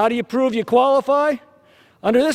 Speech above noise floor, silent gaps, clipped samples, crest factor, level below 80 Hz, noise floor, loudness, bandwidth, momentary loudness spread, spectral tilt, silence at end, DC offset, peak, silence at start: 35 dB; none; under 0.1%; 16 dB; -60 dBFS; -52 dBFS; -18 LUFS; 14.5 kHz; 8 LU; -5 dB/octave; 0 s; under 0.1%; -4 dBFS; 0 s